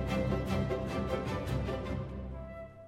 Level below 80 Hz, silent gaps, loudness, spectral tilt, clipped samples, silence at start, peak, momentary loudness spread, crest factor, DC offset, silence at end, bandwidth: -44 dBFS; none; -35 LUFS; -7 dB/octave; under 0.1%; 0 s; -20 dBFS; 11 LU; 16 dB; under 0.1%; 0 s; 16 kHz